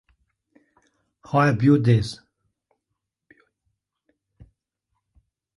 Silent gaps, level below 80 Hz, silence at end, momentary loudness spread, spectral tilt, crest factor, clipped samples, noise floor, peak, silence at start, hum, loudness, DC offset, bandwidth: none; -54 dBFS; 3.4 s; 15 LU; -8 dB/octave; 20 dB; under 0.1%; -82 dBFS; -6 dBFS; 1.3 s; none; -20 LUFS; under 0.1%; 11.5 kHz